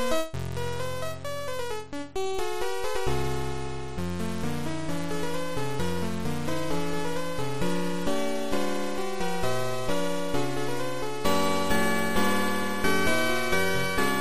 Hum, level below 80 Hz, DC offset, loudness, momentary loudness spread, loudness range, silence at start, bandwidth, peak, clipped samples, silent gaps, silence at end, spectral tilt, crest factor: none; -46 dBFS; 4%; -29 LUFS; 8 LU; 6 LU; 0 s; 15.5 kHz; -10 dBFS; under 0.1%; none; 0 s; -4.5 dB/octave; 18 dB